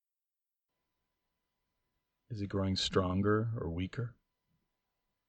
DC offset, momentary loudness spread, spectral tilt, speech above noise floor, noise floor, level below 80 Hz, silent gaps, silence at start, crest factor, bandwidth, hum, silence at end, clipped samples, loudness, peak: under 0.1%; 12 LU; -6 dB/octave; over 57 dB; under -90 dBFS; -60 dBFS; none; 2.3 s; 22 dB; 9.2 kHz; none; 1.15 s; under 0.1%; -34 LUFS; -16 dBFS